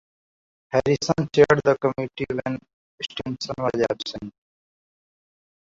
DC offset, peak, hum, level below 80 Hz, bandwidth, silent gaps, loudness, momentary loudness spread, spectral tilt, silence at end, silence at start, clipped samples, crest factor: under 0.1%; -4 dBFS; none; -54 dBFS; 7.8 kHz; 2.73-2.98 s; -23 LUFS; 15 LU; -5.5 dB/octave; 1.5 s; 0.7 s; under 0.1%; 22 dB